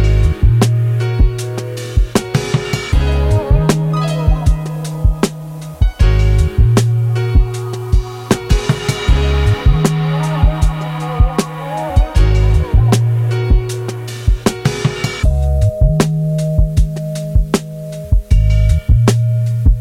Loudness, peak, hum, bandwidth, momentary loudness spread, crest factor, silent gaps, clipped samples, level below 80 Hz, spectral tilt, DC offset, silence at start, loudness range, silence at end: -15 LUFS; -2 dBFS; none; 15 kHz; 7 LU; 12 dB; none; under 0.1%; -16 dBFS; -6.5 dB/octave; under 0.1%; 0 s; 1 LU; 0 s